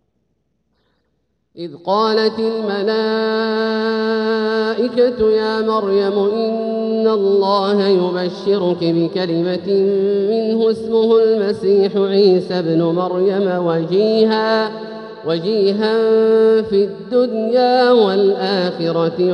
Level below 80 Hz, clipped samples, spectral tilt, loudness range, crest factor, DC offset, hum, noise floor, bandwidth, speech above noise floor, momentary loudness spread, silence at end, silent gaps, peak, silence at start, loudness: -58 dBFS; under 0.1%; -7.5 dB/octave; 3 LU; 14 dB; under 0.1%; none; -67 dBFS; 6.4 kHz; 52 dB; 6 LU; 0 s; none; -2 dBFS; 1.55 s; -16 LUFS